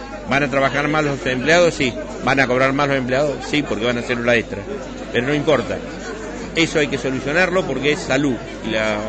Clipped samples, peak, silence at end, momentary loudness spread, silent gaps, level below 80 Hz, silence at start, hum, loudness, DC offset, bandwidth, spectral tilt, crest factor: under 0.1%; -2 dBFS; 0 s; 11 LU; none; -40 dBFS; 0 s; none; -18 LUFS; under 0.1%; 9.2 kHz; -5 dB/octave; 18 dB